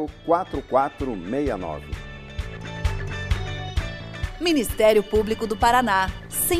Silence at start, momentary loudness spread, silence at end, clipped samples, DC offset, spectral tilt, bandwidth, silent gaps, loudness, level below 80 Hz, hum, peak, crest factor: 0 s; 15 LU; 0 s; under 0.1%; under 0.1%; -4.5 dB/octave; 15.5 kHz; none; -24 LUFS; -34 dBFS; none; -4 dBFS; 20 dB